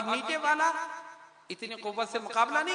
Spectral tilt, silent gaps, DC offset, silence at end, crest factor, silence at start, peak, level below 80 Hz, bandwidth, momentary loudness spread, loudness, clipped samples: -1.5 dB/octave; none; under 0.1%; 0 s; 18 dB; 0 s; -12 dBFS; -86 dBFS; 10.5 kHz; 17 LU; -30 LUFS; under 0.1%